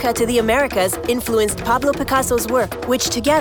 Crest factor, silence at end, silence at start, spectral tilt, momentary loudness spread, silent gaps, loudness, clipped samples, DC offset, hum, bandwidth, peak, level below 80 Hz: 14 dB; 0 s; 0 s; -3.5 dB/octave; 3 LU; none; -18 LUFS; under 0.1%; under 0.1%; none; over 20 kHz; -4 dBFS; -38 dBFS